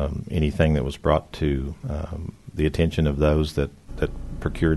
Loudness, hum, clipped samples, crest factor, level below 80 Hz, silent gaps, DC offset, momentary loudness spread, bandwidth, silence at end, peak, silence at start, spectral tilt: -24 LUFS; none; under 0.1%; 18 dB; -30 dBFS; none; 0.1%; 10 LU; 12.5 kHz; 0 s; -4 dBFS; 0 s; -7.5 dB/octave